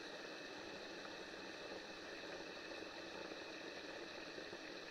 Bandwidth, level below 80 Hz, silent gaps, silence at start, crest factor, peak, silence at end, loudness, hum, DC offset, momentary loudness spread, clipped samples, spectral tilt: 15.5 kHz; -78 dBFS; none; 0 s; 16 dB; -36 dBFS; 0 s; -50 LUFS; none; under 0.1%; 1 LU; under 0.1%; -3 dB/octave